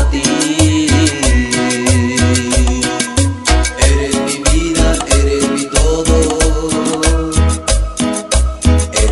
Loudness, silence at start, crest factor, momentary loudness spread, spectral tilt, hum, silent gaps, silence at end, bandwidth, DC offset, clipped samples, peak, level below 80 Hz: -13 LUFS; 0 s; 12 dB; 4 LU; -4.5 dB/octave; none; none; 0 s; 12 kHz; under 0.1%; under 0.1%; 0 dBFS; -16 dBFS